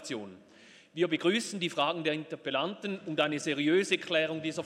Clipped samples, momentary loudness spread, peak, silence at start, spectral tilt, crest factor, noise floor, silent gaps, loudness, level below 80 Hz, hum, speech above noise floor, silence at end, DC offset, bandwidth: under 0.1%; 10 LU; -12 dBFS; 0 s; -4 dB/octave; 18 dB; -57 dBFS; none; -31 LUFS; -82 dBFS; none; 26 dB; 0 s; under 0.1%; 13.5 kHz